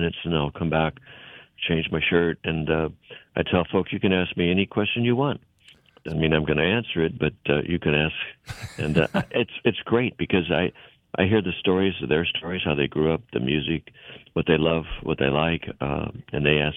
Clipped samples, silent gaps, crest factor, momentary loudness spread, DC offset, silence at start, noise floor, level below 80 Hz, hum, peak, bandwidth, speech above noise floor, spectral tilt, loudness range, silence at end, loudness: under 0.1%; none; 20 dB; 10 LU; under 0.1%; 0 s; -55 dBFS; -44 dBFS; none; -4 dBFS; 10 kHz; 31 dB; -7.5 dB/octave; 1 LU; 0 s; -24 LUFS